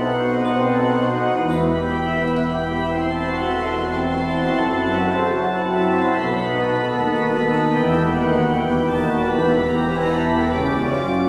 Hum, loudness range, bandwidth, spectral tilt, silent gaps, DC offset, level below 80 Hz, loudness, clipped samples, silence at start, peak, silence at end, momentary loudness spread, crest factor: none; 2 LU; 10.5 kHz; -7.5 dB/octave; none; under 0.1%; -40 dBFS; -20 LUFS; under 0.1%; 0 s; -6 dBFS; 0 s; 4 LU; 12 dB